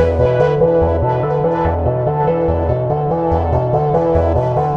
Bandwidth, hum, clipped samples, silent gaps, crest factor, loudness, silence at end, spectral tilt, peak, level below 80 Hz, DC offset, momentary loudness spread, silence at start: 6.2 kHz; none; under 0.1%; none; 12 dB; -15 LUFS; 0 s; -10 dB/octave; -2 dBFS; -28 dBFS; 0.3%; 3 LU; 0 s